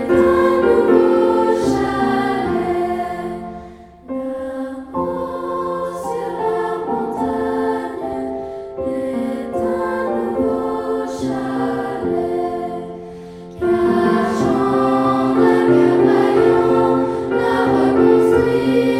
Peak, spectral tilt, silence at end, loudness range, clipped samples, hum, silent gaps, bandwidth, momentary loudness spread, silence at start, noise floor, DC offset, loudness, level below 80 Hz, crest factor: 0 dBFS; -7 dB/octave; 0 s; 9 LU; under 0.1%; none; none; 12.5 kHz; 13 LU; 0 s; -38 dBFS; under 0.1%; -17 LUFS; -46 dBFS; 16 dB